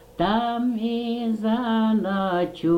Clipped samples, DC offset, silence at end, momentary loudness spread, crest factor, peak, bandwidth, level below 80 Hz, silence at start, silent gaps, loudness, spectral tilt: under 0.1%; under 0.1%; 0 s; 4 LU; 14 dB; -8 dBFS; 5.6 kHz; -52 dBFS; 0.15 s; none; -24 LUFS; -7.5 dB/octave